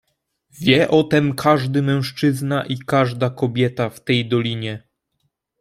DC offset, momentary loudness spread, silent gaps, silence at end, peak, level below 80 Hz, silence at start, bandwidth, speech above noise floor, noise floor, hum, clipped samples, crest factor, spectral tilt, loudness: under 0.1%; 8 LU; none; 0.85 s; -2 dBFS; -56 dBFS; 0.55 s; 15.5 kHz; 53 dB; -71 dBFS; none; under 0.1%; 18 dB; -6.5 dB/octave; -19 LUFS